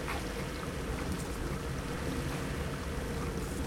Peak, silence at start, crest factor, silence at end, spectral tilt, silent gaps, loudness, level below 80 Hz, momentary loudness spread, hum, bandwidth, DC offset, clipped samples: -22 dBFS; 0 s; 14 dB; 0 s; -5 dB/octave; none; -37 LUFS; -42 dBFS; 2 LU; none; 16.5 kHz; under 0.1%; under 0.1%